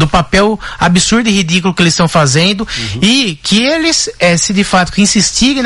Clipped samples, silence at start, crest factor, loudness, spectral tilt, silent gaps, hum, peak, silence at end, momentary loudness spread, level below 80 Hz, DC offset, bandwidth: under 0.1%; 0 s; 10 dB; -10 LUFS; -3.5 dB/octave; none; none; 0 dBFS; 0 s; 3 LU; -30 dBFS; under 0.1%; 12 kHz